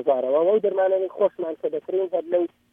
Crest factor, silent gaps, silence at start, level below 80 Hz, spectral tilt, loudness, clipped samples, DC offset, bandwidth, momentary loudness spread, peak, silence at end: 14 dB; none; 0 s; -78 dBFS; -8.5 dB/octave; -23 LUFS; under 0.1%; under 0.1%; 3.7 kHz; 7 LU; -8 dBFS; 0.25 s